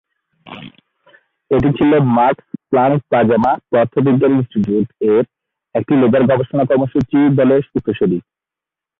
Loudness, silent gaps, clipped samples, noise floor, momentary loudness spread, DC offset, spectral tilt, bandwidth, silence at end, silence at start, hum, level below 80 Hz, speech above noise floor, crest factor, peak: -15 LUFS; none; under 0.1%; -86 dBFS; 10 LU; under 0.1%; -10.5 dB/octave; 4 kHz; 0.8 s; 0.45 s; none; -46 dBFS; 73 dB; 12 dB; -2 dBFS